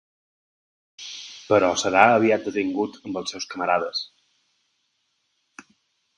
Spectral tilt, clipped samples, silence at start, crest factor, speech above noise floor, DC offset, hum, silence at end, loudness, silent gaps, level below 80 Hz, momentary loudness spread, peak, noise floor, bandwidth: -3.5 dB/octave; under 0.1%; 1 s; 24 dB; 51 dB; under 0.1%; none; 2.15 s; -22 LUFS; none; -64 dBFS; 20 LU; 0 dBFS; -72 dBFS; 11.5 kHz